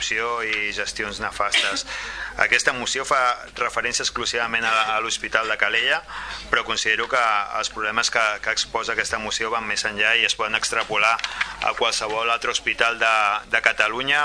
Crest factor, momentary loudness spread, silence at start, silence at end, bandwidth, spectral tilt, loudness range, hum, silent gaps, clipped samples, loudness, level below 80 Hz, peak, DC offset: 22 dB; 7 LU; 0 s; 0 s; 11 kHz; -0.5 dB/octave; 1 LU; none; none; under 0.1%; -21 LUFS; -50 dBFS; 0 dBFS; under 0.1%